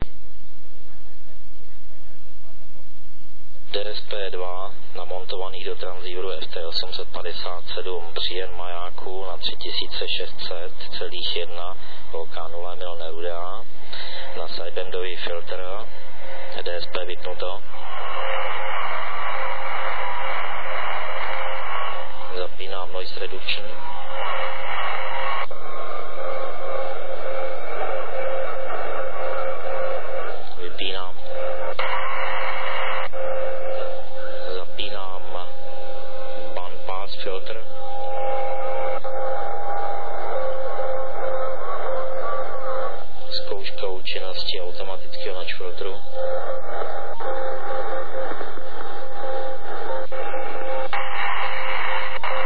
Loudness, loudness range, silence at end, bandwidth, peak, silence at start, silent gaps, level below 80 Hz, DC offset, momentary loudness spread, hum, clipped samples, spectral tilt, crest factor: -29 LUFS; 5 LU; 0 s; 4.9 kHz; -4 dBFS; 0 s; none; -48 dBFS; 30%; 8 LU; none; under 0.1%; -6.5 dB/octave; 20 dB